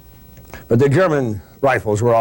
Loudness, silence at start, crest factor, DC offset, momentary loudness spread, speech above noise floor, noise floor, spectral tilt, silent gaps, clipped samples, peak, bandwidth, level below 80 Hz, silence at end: -17 LUFS; 0.35 s; 10 dB; under 0.1%; 6 LU; 27 dB; -42 dBFS; -7 dB/octave; none; under 0.1%; -6 dBFS; 16.5 kHz; -46 dBFS; 0 s